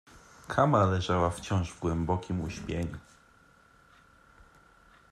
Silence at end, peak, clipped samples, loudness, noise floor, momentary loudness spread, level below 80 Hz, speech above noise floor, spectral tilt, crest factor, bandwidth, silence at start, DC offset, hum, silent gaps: 2.1 s; -10 dBFS; under 0.1%; -30 LUFS; -61 dBFS; 12 LU; -52 dBFS; 32 dB; -6.5 dB/octave; 22 dB; 12 kHz; 0.15 s; under 0.1%; none; none